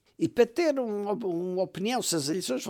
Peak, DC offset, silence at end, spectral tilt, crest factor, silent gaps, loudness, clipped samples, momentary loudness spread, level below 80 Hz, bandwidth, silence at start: -10 dBFS; under 0.1%; 0 s; -4 dB/octave; 20 dB; none; -28 LUFS; under 0.1%; 6 LU; -70 dBFS; 18.5 kHz; 0.2 s